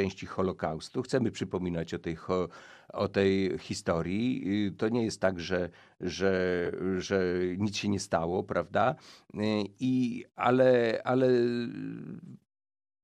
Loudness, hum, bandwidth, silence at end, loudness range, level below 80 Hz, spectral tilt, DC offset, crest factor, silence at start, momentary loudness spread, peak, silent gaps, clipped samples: -30 LUFS; none; 11 kHz; 0.65 s; 3 LU; -60 dBFS; -6 dB/octave; under 0.1%; 20 dB; 0 s; 11 LU; -10 dBFS; none; under 0.1%